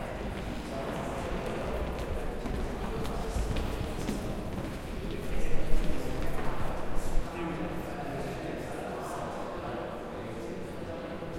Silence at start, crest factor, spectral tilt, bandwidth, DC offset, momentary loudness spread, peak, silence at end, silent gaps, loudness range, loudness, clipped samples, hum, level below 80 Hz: 0 s; 20 dB; -6 dB/octave; 15 kHz; under 0.1%; 4 LU; -10 dBFS; 0 s; none; 2 LU; -36 LUFS; under 0.1%; none; -36 dBFS